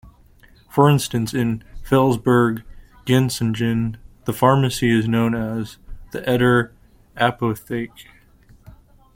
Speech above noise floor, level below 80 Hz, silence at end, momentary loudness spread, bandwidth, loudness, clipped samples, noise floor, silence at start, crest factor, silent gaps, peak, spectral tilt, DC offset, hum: 32 dB; -44 dBFS; 1.15 s; 14 LU; 16.5 kHz; -20 LUFS; under 0.1%; -50 dBFS; 0.05 s; 18 dB; none; -2 dBFS; -6 dB/octave; under 0.1%; none